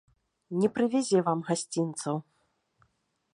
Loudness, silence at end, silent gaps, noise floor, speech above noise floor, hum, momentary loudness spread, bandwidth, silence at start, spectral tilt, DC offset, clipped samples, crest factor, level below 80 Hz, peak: -29 LUFS; 1.15 s; none; -74 dBFS; 46 dB; none; 9 LU; 11.5 kHz; 0.5 s; -5.5 dB/octave; under 0.1%; under 0.1%; 18 dB; -76 dBFS; -12 dBFS